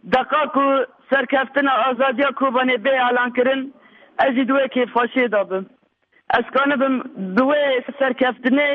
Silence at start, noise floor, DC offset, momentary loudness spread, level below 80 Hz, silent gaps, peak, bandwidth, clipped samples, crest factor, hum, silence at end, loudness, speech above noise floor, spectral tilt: 0.05 s; -61 dBFS; under 0.1%; 4 LU; -62 dBFS; none; -6 dBFS; 5.6 kHz; under 0.1%; 14 dB; none; 0 s; -19 LUFS; 42 dB; -7 dB/octave